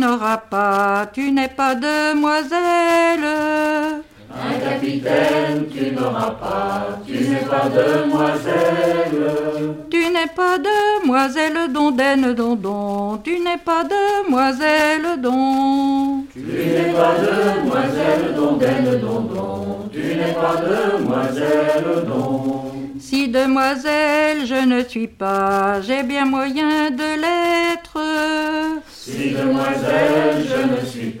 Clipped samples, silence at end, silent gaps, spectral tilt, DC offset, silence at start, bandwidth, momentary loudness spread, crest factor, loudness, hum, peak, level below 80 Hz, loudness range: under 0.1%; 0 s; none; -5.5 dB/octave; under 0.1%; 0 s; 16.5 kHz; 7 LU; 16 dB; -18 LUFS; none; -2 dBFS; -52 dBFS; 2 LU